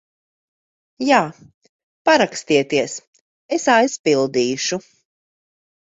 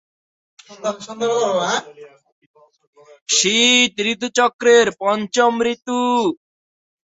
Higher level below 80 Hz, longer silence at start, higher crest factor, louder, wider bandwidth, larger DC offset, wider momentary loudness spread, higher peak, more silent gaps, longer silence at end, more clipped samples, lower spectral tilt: about the same, -64 dBFS vs -64 dBFS; first, 1 s vs 0.7 s; about the same, 18 dB vs 18 dB; about the same, -18 LUFS vs -17 LUFS; about the same, 8 kHz vs 8 kHz; neither; second, 11 LU vs 14 LU; about the same, -2 dBFS vs 0 dBFS; first, 1.54-1.61 s, 1.69-2.05 s, 3.07-3.13 s, 3.21-3.49 s, 3.99-4.04 s vs 2.32-2.54 s, 2.87-2.93 s, 3.22-3.26 s, 4.53-4.59 s; first, 1.15 s vs 0.75 s; neither; first, -3.5 dB/octave vs -1.5 dB/octave